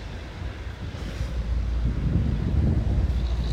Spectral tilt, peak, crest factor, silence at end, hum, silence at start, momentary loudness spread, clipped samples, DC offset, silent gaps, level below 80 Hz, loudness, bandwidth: -8 dB/octave; -10 dBFS; 14 dB; 0 s; none; 0 s; 11 LU; under 0.1%; under 0.1%; none; -28 dBFS; -28 LUFS; 8 kHz